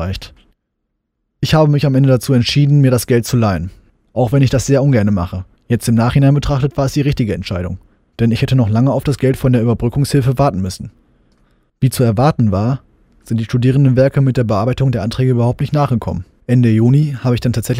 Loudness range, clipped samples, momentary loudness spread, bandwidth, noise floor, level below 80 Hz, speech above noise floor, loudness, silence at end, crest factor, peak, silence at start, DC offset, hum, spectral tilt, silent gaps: 3 LU; under 0.1%; 11 LU; 16 kHz; -71 dBFS; -36 dBFS; 58 dB; -14 LUFS; 0 s; 14 dB; 0 dBFS; 0 s; under 0.1%; none; -7 dB/octave; none